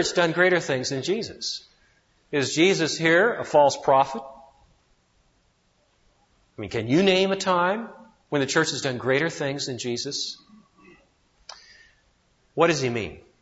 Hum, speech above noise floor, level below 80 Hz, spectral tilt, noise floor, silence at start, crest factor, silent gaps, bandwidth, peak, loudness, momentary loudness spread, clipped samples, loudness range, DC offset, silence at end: none; 43 dB; -62 dBFS; -4 dB/octave; -66 dBFS; 0 s; 20 dB; none; 8 kHz; -6 dBFS; -23 LUFS; 16 LU; under 0.1%; 7 LU; under 0.1%; 0.2 s